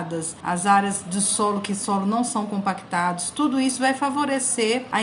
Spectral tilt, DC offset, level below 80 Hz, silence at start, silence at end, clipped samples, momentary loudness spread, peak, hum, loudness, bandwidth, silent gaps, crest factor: -3.5 dB/octave; under 0.1%; -66 dBFS; 0 s; 0 s; under 0.1%; 6 LU; -4 dBFS; none; -22 LUFS; 11.5 kHz; none; 18 dB